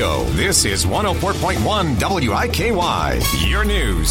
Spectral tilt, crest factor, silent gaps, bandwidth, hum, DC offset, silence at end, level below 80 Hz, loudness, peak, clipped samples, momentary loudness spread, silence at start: -4 dB/octave; 14 dB; none; 16.5 kHz; none; under 0.1%; 0 s; -26 dBFS; -17 LUFS; -2 dBFS; under 0.1%; 4 LU; 0 s